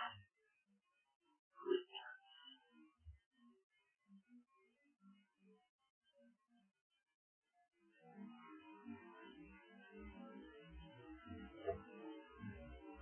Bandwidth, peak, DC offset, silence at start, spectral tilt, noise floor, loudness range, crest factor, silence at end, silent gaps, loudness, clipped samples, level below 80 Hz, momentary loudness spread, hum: 3.2 kHz; -28 dBFS; under 0.1%; 0 s; -3 dB/octave; -83 dBFS; 14 LU; 28 dB; 0 s; 1.16-1.20 s, 1.39-1.51 s, 3.26-3.31 s, 3.63-3.70 s, 5.69-5.79 s, 5.90-6.01 s, 6.81-6.90 s, 7.14-7.42 s; -53 LUFS; under 0.1%; -72 dBFS; 19 LU; none